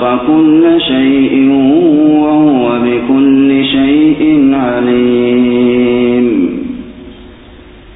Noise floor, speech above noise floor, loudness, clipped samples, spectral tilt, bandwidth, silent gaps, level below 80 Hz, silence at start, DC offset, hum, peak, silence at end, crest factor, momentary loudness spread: -34 dBFS; 27 dB; -9 LUFS; under 0.1%; -12 dB/octave; 4 kHz; none; -40 dBFS; 0 s; under 0.1%; none; 0 dBFS; 0.7 s; 8 dB; 4 LU